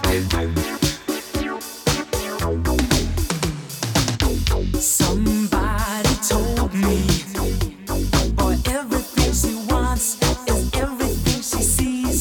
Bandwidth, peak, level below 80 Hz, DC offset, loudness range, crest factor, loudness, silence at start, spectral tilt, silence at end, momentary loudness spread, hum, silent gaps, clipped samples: over 20 kHz; -2 dBFS; -26 dBFS; under 0.1%; 3 LU; 18 dB; -21 LUFS; 0 s; -4 dB/octave; 0 s; 6 LU; none; none; under 0.1%